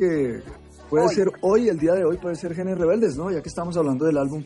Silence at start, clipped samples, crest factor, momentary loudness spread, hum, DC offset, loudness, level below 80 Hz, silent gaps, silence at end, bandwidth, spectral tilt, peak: 0 s; under 0.1%; 14 dB; 8 LU; none; under 0.1%; -22 LUFS; -50 dBFS; none; 0 s; 11.5 kHz; -7 dB/octave; -8 dBFS